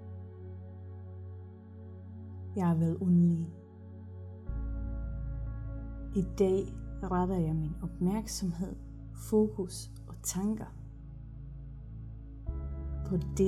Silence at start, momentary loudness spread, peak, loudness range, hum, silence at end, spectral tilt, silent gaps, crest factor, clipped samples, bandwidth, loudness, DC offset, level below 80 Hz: 0 s; 18 LU; -16 dBFS; 6 LU; none; 0 s; -7 dB/octave; none; 18 dB; under 0.1%; 14 kHz; -33 LUFS; under 0.1%; -44 dBFS